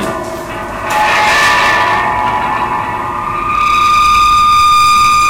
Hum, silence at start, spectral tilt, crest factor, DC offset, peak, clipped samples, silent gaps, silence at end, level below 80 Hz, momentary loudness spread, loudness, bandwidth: none; 0 s; -2.5 dB/octave; 8 dB; under 0.1%; -2 dBFS; under 0.1%; none; 0 s; -32 dBFS; 12 LU; -10 LUFS; 16 kHz